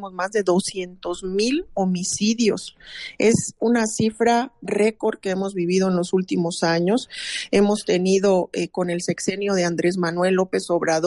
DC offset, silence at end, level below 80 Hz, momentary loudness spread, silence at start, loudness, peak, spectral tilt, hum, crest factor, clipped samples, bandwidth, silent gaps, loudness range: under 0.1%; 0 s; -56 dBFS; 7 LU; 0 s; -21 LUFS; -6 dBFS; -5 dB/octave; none; 14 dB; under 0.1%; 11.5 kHz; none; 2 LU